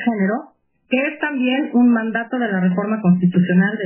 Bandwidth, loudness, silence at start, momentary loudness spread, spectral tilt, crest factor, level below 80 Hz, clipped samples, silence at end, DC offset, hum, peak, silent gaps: 3.2 kHz; -18 LUFS; 0 s; 6 LU; -11.5 dB/octave; 12 dB; -68 dBFS; under 0.1%; 0 s; under 0.1%; none; -4 dBFS; none